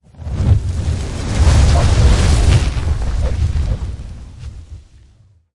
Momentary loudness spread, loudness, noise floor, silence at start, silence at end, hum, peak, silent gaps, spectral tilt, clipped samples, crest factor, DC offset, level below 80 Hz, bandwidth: 21 LU; -16 LUFS; -49 dBFS; 0.2 s; 0.75 s; none; -2 dBFS; none; -6 dB/octave; under 0.1%; 12 dB; under 0.1%; -18 dBFS; 11.5 kHz